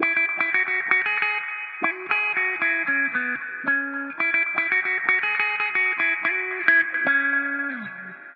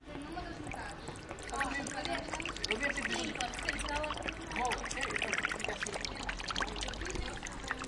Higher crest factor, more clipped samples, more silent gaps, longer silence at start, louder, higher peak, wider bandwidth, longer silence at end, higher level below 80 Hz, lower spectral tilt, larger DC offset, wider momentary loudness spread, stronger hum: about the same, 22 dB vs 24 dB; neither; neither; about the same, 0 s vs 0 s; first, -21 LUFS vs -37 LUFS; first, -2 dBFS vs -14 dBFS; second, 5.4 kHz vs 11.5 kHz; about the same, 0 s vs 0 s; second, -84 dBFS vs -48 dBFS; first, -5.5 dB/octave vs -2.5 dB/octave; neither; about the same, 7 LU vs 9 LU; neither